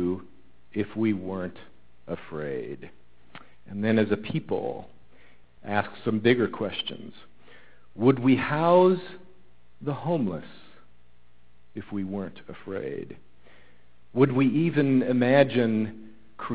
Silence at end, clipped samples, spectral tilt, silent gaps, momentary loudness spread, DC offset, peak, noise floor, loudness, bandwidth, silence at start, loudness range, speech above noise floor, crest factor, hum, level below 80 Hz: 0 s; under 0.1%; -11 dB/octave; none; 19 LU; 0.6%; -4 dBFS; -63 dBFS; -26 LUFS; 4 kHz; 0 s; 10 LU; 38 dB; 22 dB; 60 Hz at -60 dBFS; -60 dBFS